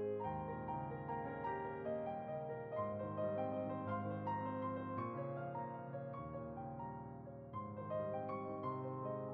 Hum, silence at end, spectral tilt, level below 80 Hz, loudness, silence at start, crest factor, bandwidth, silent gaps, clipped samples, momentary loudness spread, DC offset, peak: none; 0 s; -8 dB/octave; -68 dBFS; -44 LUFS; 0 s; 14 dB; 4.8 kHz; none; under 0.1%; 6 LU; under 0.1%; -30 dBFS